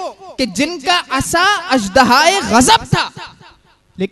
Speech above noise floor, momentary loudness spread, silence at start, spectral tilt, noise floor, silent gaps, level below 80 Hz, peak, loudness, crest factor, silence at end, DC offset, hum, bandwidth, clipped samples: 36 dB; 13 LU; 0 s; -3 dB/octave; -49 dBFS; none; -40 dBFS; 0 dBFS; -13 LUFS; 14 dB; 0.05 s; under 0.1%; none; 12.5 kHz; 0.1%